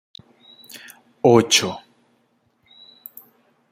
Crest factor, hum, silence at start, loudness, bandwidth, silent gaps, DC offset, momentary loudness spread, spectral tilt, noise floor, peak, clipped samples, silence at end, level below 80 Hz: 22 dB; none; 1.25 s; -17 LUFS; 16 kHz; none; under 0.1%; 26 LU; -3.5 dB/octave; -65 dBFS; -2 dBFS; under 0.1%; 1.95 s; -64 dBFS